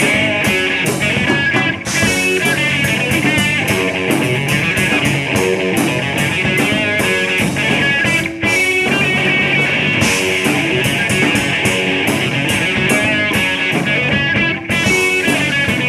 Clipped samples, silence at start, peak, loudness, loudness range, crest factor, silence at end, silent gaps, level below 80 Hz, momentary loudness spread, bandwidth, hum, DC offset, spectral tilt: under 0.1%; 0 s; 0 dBFS; -13 LUFS; 1 LU; 14 dB; 0 s; none; -42 dBFS; 3 LU; 15.5 kHz; none; under 0.1%; -4 dB/octave